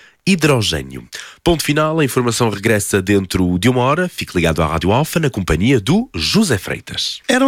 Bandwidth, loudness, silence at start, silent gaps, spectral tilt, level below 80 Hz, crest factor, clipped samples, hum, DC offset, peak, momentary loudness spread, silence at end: 17 kHz; -16 LUFS; 0.25 s; none; -5 dB/octave; -34 dBFS; 14 dB; under 0.1%; none; under 0.1%; -2 dBFS; 6 LU; 0 s